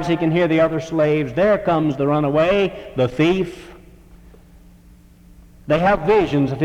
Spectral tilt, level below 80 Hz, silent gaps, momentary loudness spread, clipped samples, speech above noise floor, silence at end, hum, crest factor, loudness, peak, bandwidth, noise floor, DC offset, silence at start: -7.5 dB/octave; -44 dBFS; none; 6 LU; under 0.1%; 29 dB; 0 s; none; 14 dB; -18 LUFS; -4 dBFS; 11.5 kHz; -47 dBFS; under 0.1%; 0 s